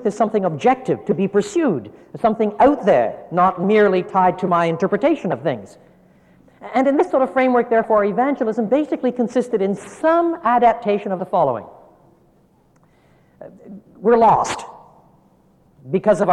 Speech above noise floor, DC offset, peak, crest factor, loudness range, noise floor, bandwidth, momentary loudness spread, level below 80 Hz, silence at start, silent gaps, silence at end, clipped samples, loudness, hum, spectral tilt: 38 dB; under 0.1%; -4 dBFS; 14 dB; 5 LU; -56 dBFS; 11 kHz; 8 LU; -56 dBFS; 0 s; none; 0 s; under 0.1%; -18 LUFS; none; -6.5 dB/octave